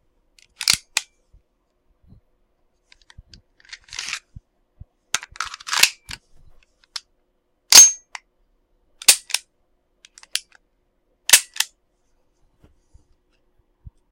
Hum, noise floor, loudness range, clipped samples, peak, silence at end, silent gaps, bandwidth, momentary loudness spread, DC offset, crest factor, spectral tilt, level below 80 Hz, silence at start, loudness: none; -68 dBFS; 20 LU; under 0.1%; 0 dBFS; 2.45 s; none; 16.5 kHz; 26 LU; under 0.1%; 24 dB; 3 dB/octave; -56 dBFS; 0.6 s; -15 LUFS